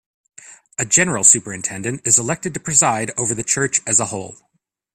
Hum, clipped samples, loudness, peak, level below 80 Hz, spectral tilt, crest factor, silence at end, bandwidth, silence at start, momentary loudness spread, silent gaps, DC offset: none; under 0.1%; -16 LUFS; 0 dBFS; -56 dBFS; -2.5 dB/octave; 20 dB; 0.6 s; 15.5 kHz; 0.45 s; 14 LU; none; under 0.1%